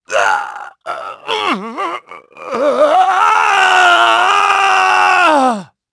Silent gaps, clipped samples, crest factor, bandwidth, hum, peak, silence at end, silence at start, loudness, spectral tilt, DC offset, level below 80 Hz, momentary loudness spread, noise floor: none; under 0.1%; 12 dB; 11 kHz; none; 0 dBFS; 0.3 s; 0.1 s; -11 LUFS; -2 dB/octave; under 0.1%; -62 dBFS; 16 LU; -34 dBFS